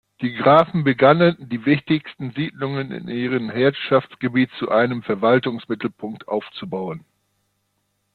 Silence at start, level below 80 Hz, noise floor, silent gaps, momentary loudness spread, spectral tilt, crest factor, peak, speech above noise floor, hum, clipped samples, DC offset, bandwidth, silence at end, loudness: 0.2 s; -60 dBFS; -71 dBFS; none; 14 LU; -9 dB/octave; 18 dB; -2 dBFS; 51 dB; 50 Hz at -55 dBFS; under 0.1%; under 0.1%; 4.8 kHz; 1.15 s; -20 LUFS